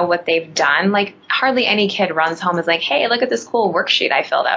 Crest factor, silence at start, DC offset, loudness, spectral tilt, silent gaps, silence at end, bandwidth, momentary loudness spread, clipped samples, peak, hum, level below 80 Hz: 16 dB; 0 s; under 0.1%; -16 LUFS; -3.5 dB/octave; none; 0 s; 8 kHz; 4 LU; under 0.1%; 0 dBFS; none; -68 dBFS